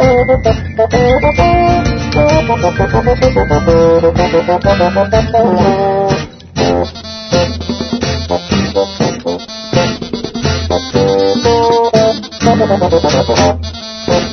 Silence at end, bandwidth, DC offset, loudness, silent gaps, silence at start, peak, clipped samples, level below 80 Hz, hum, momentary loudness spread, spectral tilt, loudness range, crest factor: 0 s; 6.6 kHz; under 0.1%; -12 LUFS; none; 0 s; 0 dBFS; under 0.1%; -26 dBFS; none; 8 LU; -6 dB/octave; 5 LU; 12 dB